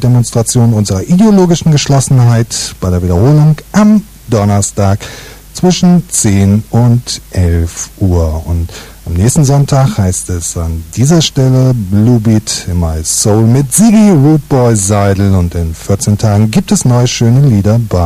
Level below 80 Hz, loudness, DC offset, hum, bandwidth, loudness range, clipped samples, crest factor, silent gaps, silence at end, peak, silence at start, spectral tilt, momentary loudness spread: -26 dBFS; -9 LUFS; under 0.1%; none; 15.5 kHz; 3 LU; under 0.1%; 8 dB; none; 0 s; 0 dBFS; 0 s; -6 dB/octave; 8 LU